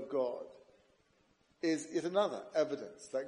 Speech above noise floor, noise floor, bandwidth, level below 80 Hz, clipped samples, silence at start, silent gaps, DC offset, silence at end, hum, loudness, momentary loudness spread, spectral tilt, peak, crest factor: 37 dB; -72 dBFS; 11 kHz; -82 dBFS; under 0.1%; 0 s; none; under 0.1%; 0 s; none; -36 LUFS; 10 LU; -4.5 dB/octave; -18 dBFS; 18 dB